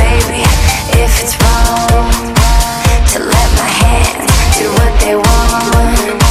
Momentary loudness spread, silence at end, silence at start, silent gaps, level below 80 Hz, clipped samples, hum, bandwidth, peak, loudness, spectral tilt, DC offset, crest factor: 2 LU; 0 s; 0 s; none; -12 dBFS; under 0.1%; none; 15.5 kHz; 0 dBFS; -10 LUFS; -4 dB/octave; under 0.1%; 8 dB